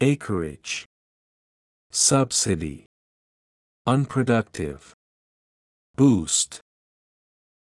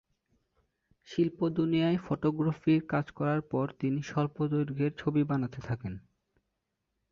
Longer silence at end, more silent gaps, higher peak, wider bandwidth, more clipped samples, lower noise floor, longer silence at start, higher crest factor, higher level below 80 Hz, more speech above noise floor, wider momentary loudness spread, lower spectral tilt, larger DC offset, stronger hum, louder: about the same, 1.05 s vs 1.1 s; first, 0.86-1.90 s, 2.86-3.85 s, 4.94-5.94 s vs none; first, -6 dBFS vs -14 dBFS; first, 12 kHz vs 7 kHz; neither; first, under -90 dBFS vs -83 dBFS; second, 0 s vs 1.1 s; about the same, 20 dB vs 16 dB; first, -54 dBFS vs -62 dBFS; first, over 68 dB vs 53 dB; first, 15 LU vs 9 LU; second, -4 dB/octave vs -8.5 dB/octave; neither; neither; first, -23 LUFS vs -31 LUFS